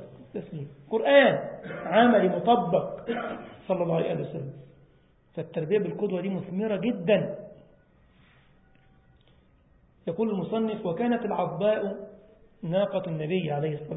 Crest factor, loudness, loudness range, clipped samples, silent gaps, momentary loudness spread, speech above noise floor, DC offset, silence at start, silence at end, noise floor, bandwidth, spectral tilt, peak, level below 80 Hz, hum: 22 dB; -26 LUFS; 10 LU; under 0.1%; none; 19 LU; 34 dB; under 0.1%; 0 s; 0 s; -61 dBFS; 4 kHz; -10.5 dB/octave; -6 dBFS; -64 dBFS; none